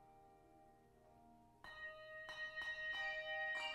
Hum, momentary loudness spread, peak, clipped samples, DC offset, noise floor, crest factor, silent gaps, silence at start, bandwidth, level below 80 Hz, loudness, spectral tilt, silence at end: none; 25 LU; -34 dBFS; under 0.1%; under 0.1%; -69 dBFS; 16 dB; none; 0 s; 13.5 kHz; -76 dBFS; -46 LUFS; -1.5 dB/octave; 0 s